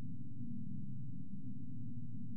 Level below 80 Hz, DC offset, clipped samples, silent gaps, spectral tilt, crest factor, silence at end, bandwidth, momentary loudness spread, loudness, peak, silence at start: -74 dBFS; 1%; under 0.1%; none; -19.5 dB/octave; 10 dB; 0 s; 0.6 kHz; 2 LU; -48 LUFS; -32 dBFS; 0 s